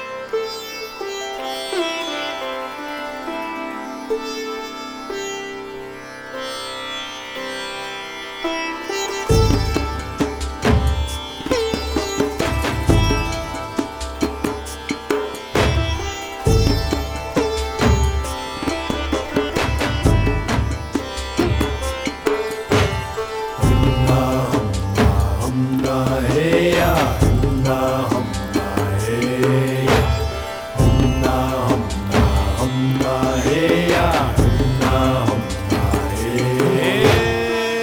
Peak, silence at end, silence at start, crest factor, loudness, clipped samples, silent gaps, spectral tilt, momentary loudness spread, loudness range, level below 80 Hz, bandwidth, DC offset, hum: -2 dBFS; 0 s; 0 s; 18 dB; -20 LUFS; under 0.1%; none; -5.5 dB/octave; 11 LU; 9 LU; -26 dBFS; over 20 kHz; under 0.1%; none